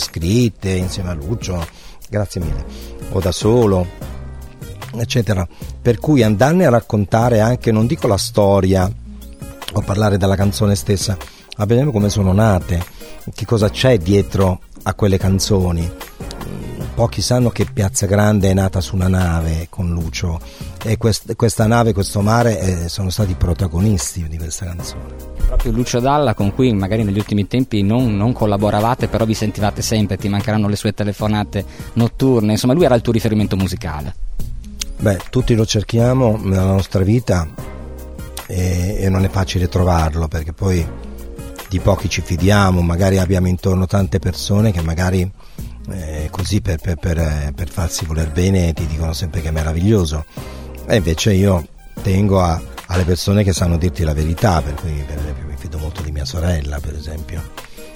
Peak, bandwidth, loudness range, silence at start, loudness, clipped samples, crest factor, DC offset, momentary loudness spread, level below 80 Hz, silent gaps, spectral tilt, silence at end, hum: 0 dBFS; 16.5 kHz; 4 LU; 0 s; -17 LUFS; under 0.1%; 16 dB; under 0.1%; 15 LU; -28 dBFS; none; -6 dB/octave; 0 s; none